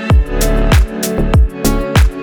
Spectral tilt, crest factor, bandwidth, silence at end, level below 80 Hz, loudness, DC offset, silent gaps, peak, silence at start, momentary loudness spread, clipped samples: -5.5 dB/octave; 10 dB; over 20 kHz; 0 s; -14 dBFS; -14 LUFS; under 0.1%; none; 0 dBFS; 0 s; 4 LU; under 0.1%